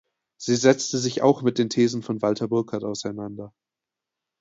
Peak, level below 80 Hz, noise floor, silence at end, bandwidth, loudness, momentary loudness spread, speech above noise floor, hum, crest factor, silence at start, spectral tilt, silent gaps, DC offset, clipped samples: -4 dBFS; -66 dBFS; -88 dBFS; 0.95 s; 8 kHz; -23 LUFS; 14 LU; 65 dB; none; 22 dB; 0.4 s; -5 dB/octave; none; under 0.1%; under 0.1%